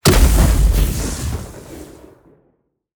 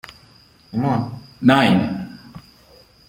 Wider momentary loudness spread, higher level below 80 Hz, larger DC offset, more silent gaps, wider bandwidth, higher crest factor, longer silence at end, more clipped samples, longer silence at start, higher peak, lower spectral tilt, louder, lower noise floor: about the same, 23 LU vs 22 LU; first, -18 dBFS vs -54 dBFS; neither; neither; first, over 20 kHz vs 16 kHz; about the same, 16 dB vs 20 dB; first, 1.15 s vs 0.7 s; neither; second, 0.05 s vs 0.75 s; about the same, -2 dBFS vs -2 dBFS; second, -5 dB/octave vs -7 dB/octave; about the same, -17 LUFS vs -19 LUFS; first, -63 dBFS vs -51 dBFS